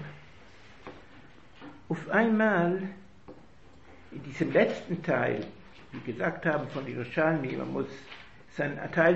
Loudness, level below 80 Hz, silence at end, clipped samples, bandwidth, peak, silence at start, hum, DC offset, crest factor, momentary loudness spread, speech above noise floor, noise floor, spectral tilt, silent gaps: -29 LUFS; -62 dBFS; 0 s; under 0.1%; 8 kHz; -10 dBFS; 0 s; none; 0.2%; 22 dB; 23 LU; 27 dB; -56 dBFS; -7.5 dB/octave; none